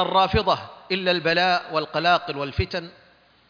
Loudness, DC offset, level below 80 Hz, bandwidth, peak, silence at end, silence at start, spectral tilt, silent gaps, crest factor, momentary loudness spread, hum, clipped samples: -22 LUFS; under 0.1%; -42 dBFS; 5.4 kHz; -6 dBFS; 0.6 s; 0 s; -5.5 dB/octave; none; 16 dB; 9 LU; none; under 0.1%